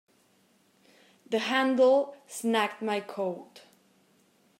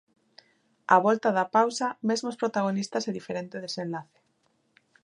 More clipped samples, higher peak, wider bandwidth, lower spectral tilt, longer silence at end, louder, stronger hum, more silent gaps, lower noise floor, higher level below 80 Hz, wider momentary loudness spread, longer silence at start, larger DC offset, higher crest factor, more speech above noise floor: neither; second, -12 dBFS vs -4 dBFS; first, 16 kHz vs 11 kHz; about the same, -4 dB/octave vs -4.5 dB/octave; first, 1.15 s vs 1 s; about the same, -28 LUFS vs -27 LUFS; neither; neither; second, -66 dBFS vs -71 dBFS; second, -88 dBFS vs -78 dBFS; about the same, 12 LU vs 13 LU; first, 1.3 s vs 0.9 s; neither; second, 18 dB vs 24 dB; second, 39 dB vs 44 dB